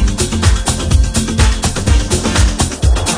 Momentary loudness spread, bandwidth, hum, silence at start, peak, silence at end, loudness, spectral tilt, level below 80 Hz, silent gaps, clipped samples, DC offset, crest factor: 2 LU; 10.5 kHz; none; 0 s; 0 dBFS; 0 s; -14 LUFS; -4 dB/octave; -16 dBFS; none; under 0.1%; under 0.1%; 12 dB